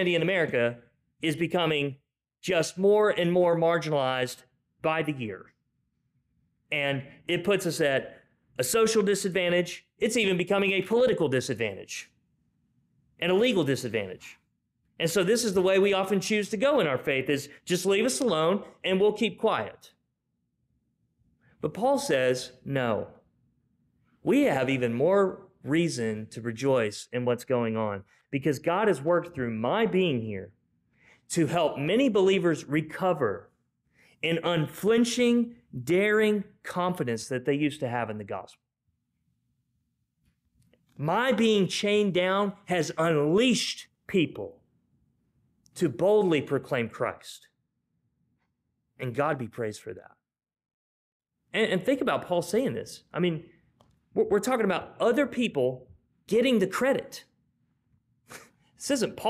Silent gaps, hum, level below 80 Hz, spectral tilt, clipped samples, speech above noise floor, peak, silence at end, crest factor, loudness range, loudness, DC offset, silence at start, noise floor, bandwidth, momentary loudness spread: 50.74-51.20 s; none; -66 dBFS; -5 dB/octave; under 0.1%; 52 dB; -14 dBFS; 0 s; 14 dB; 6 LU; -27 LUFS; under 0.1%; 0 s; -79 dBFS; 15.5 kHz; 12 LU